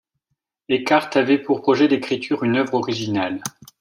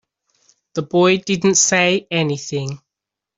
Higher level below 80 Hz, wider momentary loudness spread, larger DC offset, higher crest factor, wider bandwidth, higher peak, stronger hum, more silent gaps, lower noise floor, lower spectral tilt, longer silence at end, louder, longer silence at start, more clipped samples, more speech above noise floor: second, -66 dBFS vs -60 dBFS; second, 7 LU vs 15 LU; neither; about the same, 18 dB vs 16 dB; first, 15.5 kHz vs 8 kHz; about the same, -2 dBFS vs -2 dBFS; neither; neither; second, -77 dBFS vs -84 dBFS; first, -5 dB/octave vs -3.5 dB/octave; second, 0.3 s vs 0.6 s; second, -20 LUFS vs -16 LUFS; about the same, 0.7 s vs 0.75 s; neither; second, 57 dB vs 67 dB